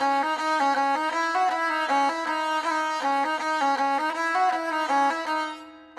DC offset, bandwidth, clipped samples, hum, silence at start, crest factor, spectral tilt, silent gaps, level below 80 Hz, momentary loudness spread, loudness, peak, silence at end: under 0.1%; 13.5 kHz; under 0.1%; none; 0 s; 12 dB; -1 dB/octave; none; -74 dBFS; 4 LU; -24 LUFS; -12 dBFS; 0.15 s